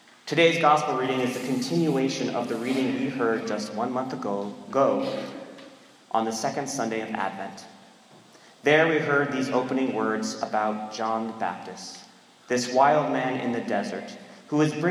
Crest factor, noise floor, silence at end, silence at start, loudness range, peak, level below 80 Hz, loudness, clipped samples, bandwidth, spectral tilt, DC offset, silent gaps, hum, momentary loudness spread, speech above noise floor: 20 dB; -53 dBFS; 0 s; 0.25 s; 4 LU; -6 dBFS; -78 dBFS; -25 LUFS; under 0.1%; 15.5 kHz; -5 dB/octave; under 0.1%; none; none; 16 LU; 27 dB